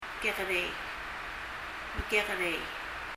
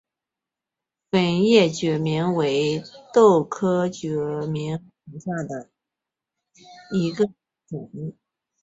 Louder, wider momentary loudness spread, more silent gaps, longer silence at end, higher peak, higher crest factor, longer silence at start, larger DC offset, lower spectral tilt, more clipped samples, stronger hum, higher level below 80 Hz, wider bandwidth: second, -33 LUFS vs -22 LUFS; second, 9 LU vs 19 LU; neither; second, 0 s vs 0.5 s; second, -14 dBFS vs -4 dBFS; about the same, 20 dB vs 20 dB; second, 0 s vs 1.15 s; neither; second, -3 dB/octave vs -6 dB/octave; neither; neither; first, -50 dBFS vs -62 dBFS; first, 16 kHz vs 8 kHz